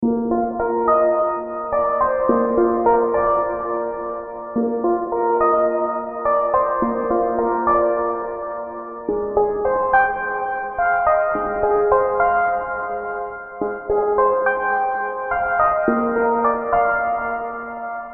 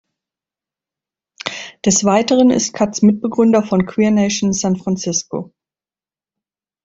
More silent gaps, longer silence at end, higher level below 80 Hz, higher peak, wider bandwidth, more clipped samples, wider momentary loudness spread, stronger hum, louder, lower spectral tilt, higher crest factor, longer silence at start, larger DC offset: neither; second, 0 s vs 1.4 s; first, -46 dBFS vs -54 dBFS; about the same, -2 dBFS vs 0 dBFS; second, 3.3 kHz vs 8 kHz; neither; second, 10 LU vs 13 LU; neither; second, -20 LUFS vs -15 LUFS; first, -6.5 dB/octave vs -4.5 dB/octave; about the same, 16 dB vs 16 dB; second, 0 s vs 1.45 s; neither